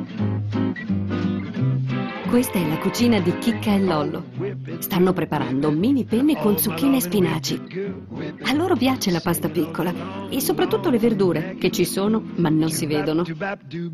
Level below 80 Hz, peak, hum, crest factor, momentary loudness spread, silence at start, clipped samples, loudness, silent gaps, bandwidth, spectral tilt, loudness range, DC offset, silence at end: -52 dBFS; -8 dBFS; none; 14 dB; 9 LU; 0 s; under 0.1%; -22 LUFS; none; 15.5 kHz; -5.5 dB/octave; 2 LU; under 0.1%; 0 s